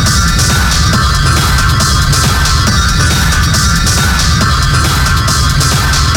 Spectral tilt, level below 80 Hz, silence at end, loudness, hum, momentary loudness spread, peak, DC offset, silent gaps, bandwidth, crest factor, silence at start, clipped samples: -3 dB/octave; -14 dBFS; 0 s; -9 LUFS; none; 1 LU; 0 dBFS; 0.4%; none; 18.5 kHz; 8 dB; 0 s; under 0.1%